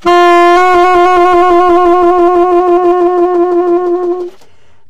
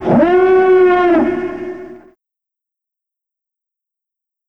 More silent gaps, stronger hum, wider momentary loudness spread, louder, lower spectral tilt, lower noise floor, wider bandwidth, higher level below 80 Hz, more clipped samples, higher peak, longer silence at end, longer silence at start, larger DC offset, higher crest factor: neither; neither; second, 7 LU vs 17 LU; first, -8 LUFS vs -11 LUFS; second, -4.5 dB/octave vs -8.5 dB/octave; second, -47 dBFS vs -84 dBFS; first, 8.8 kHz vs 5.4 kHz; first, -38 dBFS vs -48 dBFS; neither; about the same, 0 dBFS vs 0 dBFS; second, 0 s vs 2.5 s; about the same, 0 s vs 0 s; neither; second, 8 dB vs 16 dB